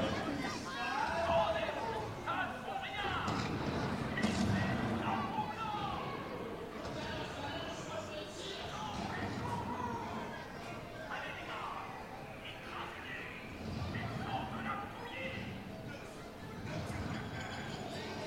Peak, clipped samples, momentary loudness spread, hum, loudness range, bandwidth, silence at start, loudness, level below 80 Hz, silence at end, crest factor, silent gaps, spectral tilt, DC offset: -20 dBFS; under 0.1%; 10 LU; none; 7 LU; 16 kHz; 0 s; -39 LUFS; -56 dBFS; 0 s; 18 dB; none; -5.5 dB/octave; under 0.1%